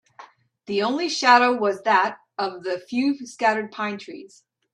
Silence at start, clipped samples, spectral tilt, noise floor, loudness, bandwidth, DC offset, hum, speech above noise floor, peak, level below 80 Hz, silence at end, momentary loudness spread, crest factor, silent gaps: 0.2 s; under 0.1%; -3.5 dB/octave; -49 dBFS; -22 LUFS; 11 kHz; under 0.1%; none; 27 dB; -2 dBFS; -74 dBFS; 0.5 s; 13 LU; 20 dB; none